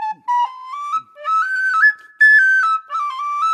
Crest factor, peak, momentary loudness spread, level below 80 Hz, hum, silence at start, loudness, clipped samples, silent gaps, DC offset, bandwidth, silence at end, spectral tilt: 12 dB; -4 dBFS; 14 LU; under -90 dBFS; none; 0 s; -15 LUFS; under 0.1%; none; under 0.1%; 11.5 kHz; 0 s; 1.5 dB/octave